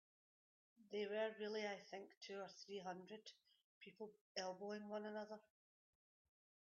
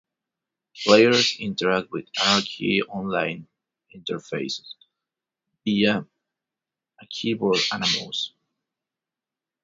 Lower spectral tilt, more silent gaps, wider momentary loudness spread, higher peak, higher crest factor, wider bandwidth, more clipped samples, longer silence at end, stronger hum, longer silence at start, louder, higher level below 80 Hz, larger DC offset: second, -2.5 dB/octave vs -4 dB/octave; first, 2.17-2.21 s, 3.64-3.81 s, 4.21-4.35 s vs none; about the same, 13 LU vs 15 LU; second, -32 dBFS vs 0 dBFS; about the same, 20 dB vs 24 dB; second, 7 kHz vs 7.8 kHz; neither; second, 1.2 s vs 1.35 s; neither; about the same, 0.8 s vs 0.75 s; second, -51 LUFS vs -23 LUFS; second, under -90 dBFS vs -64 dBFS; neither